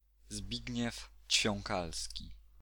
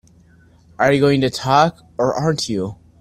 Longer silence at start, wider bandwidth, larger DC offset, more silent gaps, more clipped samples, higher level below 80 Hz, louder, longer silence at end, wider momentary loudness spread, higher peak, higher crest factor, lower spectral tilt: second, 0.25 s vs 0.8 s; first, 19.5 kHz vs 13.5 kHz; neither; neither; neither; about the same, -52 dBFS vs -50 dBFS; second, -36 LUFS vs -18 LUFS; about the same, 0.2 s vs 0.25 s; first, 17 LU vs 8 LU; second, -16 dBFS vs 0 dBFS; about the same, 22 dB vs 18 dB; second, -2.5 dB/octave vs -5.5 dB/octave